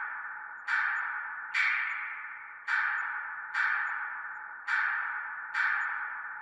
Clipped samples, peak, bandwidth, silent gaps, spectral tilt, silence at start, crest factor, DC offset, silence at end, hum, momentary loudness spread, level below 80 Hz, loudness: under 0.1%; -16 dBFS; 11 kHz; none; 1.5 dB/octave; 0 s; 18 dB; under 0.1%; 0 s; none; 11 LU; -84 dBFS; -32 LUFS